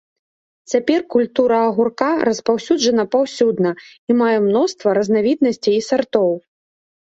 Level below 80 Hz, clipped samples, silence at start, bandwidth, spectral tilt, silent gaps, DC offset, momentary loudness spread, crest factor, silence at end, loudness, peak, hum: -62 dBFS; under 0.1%; 0.7 s; 8 kHz; -5 dB/octave; 3.99-4.07 s; under 0.1%; 4 LU; 16 dB; 0.75 s; -17 LUFS; -2 dBFS; none